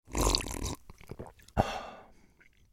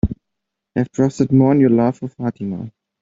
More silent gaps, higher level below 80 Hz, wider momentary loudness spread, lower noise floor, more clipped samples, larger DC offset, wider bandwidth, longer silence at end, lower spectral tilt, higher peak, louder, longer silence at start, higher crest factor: neither; about the same, -40 dBFS vs -38 dBFS; first, 19 LU vs 16 LU; second, -62 dBFS vs -80 dBFS; neither; neither; first, 16.5 kHz vs 7.8 kHz; first, 0.6 s vs 0.3 s; second, -3.5 dB/octave vs -9 dB/octave; second, -6 dBFS vs -2 dBFS; second, -33 LUFS vs -18 LUFS; about the same, 0.1 s vs 0.05 s; first, 28 dB vs 16 dB